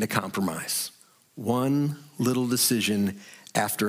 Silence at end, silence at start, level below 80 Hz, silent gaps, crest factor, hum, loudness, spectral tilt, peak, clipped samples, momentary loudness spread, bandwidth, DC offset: 0 s; 0 s; -72 dBFS; none; 20 dB; none; -26 LUFS; -4 dB/octave; -8 dBFS; under 0.1%; 9 LU; 16.5 kHz; under 0.1%